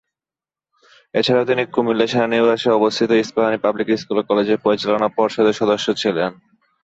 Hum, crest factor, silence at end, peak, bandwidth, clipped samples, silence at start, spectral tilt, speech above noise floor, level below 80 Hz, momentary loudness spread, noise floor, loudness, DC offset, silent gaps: none; 16 dB; 0.5 s; -4 dBFS; 8 kHz; under 0.1%; 1.15 s; -5 dB/octave; over 73 dB; -60 dBFS; 4 LU; under -90 dBFS; -18 LUFS; under 0.1%; none